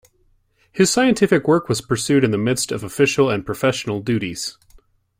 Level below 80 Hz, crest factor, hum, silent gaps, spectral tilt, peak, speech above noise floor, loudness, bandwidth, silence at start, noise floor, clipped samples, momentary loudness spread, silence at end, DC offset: -52 dBFS; 18 dB; none; none; -4.5 dB/octave; -2 dBFS; 42 dB; -19 LUFS; 16 kHz; 0.75 s; -60 dBFS; under 0.1%; 9 LU; 0.7 s; under 0.1%